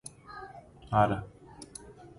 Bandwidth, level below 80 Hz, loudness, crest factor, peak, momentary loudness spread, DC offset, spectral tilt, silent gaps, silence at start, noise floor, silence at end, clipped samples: 11.5 kHz; -54 dBFS; -29 LUFS; 24 dB; -10 dBFS; 23 LU; under 0.1%; -6 dB/octave; none; 0.05 s; -50 dBFS; 0.1 s; under 0.1%